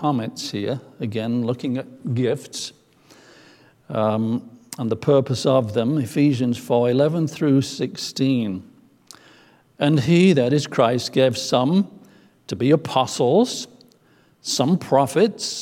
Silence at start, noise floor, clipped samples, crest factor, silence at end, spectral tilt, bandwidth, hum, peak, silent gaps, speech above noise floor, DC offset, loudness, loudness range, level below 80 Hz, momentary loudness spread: 0 s; -57 dBFS; under 0.1%; 18 dB; 0 s; -6 dB/octave; 16.5 kHz; none; -4 dBFS; none; 37 dB; under 0.1%; -21 LUFS; 7 LU; -64 dBFS; 11 LU